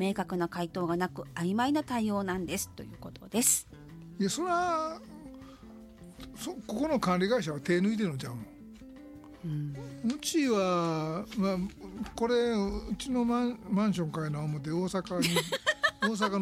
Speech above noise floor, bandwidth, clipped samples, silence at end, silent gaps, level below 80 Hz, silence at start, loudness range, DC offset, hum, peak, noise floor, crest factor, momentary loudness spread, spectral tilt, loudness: 19 dB; 16 kHz; under 0.1%; 0 s; none; -56 dBFS; 0 s; 2 LU; under 0.1%; none; -12 dBFS; -50 dBFS; 18 dB; 20 LU; -4.5 dB/octave; -31 LUFS